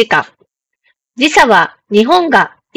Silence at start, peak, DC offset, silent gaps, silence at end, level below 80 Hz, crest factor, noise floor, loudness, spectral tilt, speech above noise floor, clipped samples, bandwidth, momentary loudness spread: 0 s; 0 dBFS; under 0.1%; none; 0.3 s; -50 dBFS; 12 dB; -61 dBFS; -10 LUFS; -3.5 dB/octave; 51 dB; 1%; over 20 kHz; 7 LU